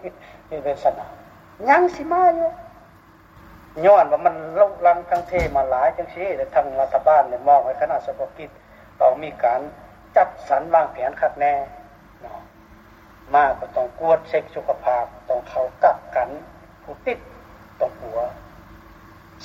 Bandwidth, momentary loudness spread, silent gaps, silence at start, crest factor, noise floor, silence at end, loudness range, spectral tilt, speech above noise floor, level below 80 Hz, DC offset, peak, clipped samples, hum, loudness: 7.6 kHz; 17 LU; none; 0.05 s; 18 dB; -49 dBFS; 0 s; 5 LU; -6.5 dB/octave; 29 dB; -48 dBFS; under 0.1%; -4 dBFS; under 0.1%; none; -20 LUFS